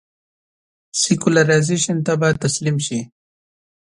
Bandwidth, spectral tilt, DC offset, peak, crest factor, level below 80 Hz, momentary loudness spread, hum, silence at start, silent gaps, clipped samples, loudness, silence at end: 11.5 kHz; -4.5 dB/octave; under 0.1%; 0 dBFS; 20 dB; -56 dBFS; 11 LU; none; 0.95 s; none; under 0.1%; -18 LUFS; 0.9 s